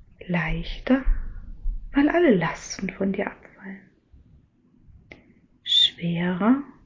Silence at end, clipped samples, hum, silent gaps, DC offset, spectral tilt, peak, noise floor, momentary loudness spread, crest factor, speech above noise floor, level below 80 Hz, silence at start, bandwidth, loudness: 0.2 s; under 0.1%; none; none; under 0.1%; -5 dB/octave; -8 dBFS; -58 dBFS; 23 LU; 18 dB; 35 dB; -36 dBFS; 0.2 s; 7.6 kHz; -23 LUFS